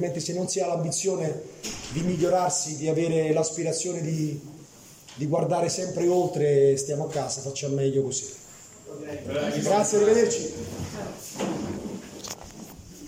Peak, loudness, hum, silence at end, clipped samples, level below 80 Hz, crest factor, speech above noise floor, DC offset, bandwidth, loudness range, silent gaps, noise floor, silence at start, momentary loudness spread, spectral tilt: -10 dBFS; -26 LUFS; none; 0 s; under 0.1%; -58 dBFS; 18 dB; 23 dB; under 0.1%; 16 kHz; 2 LU; none; -49 dBFS; 0 s; 17 LU; -5 dB/octave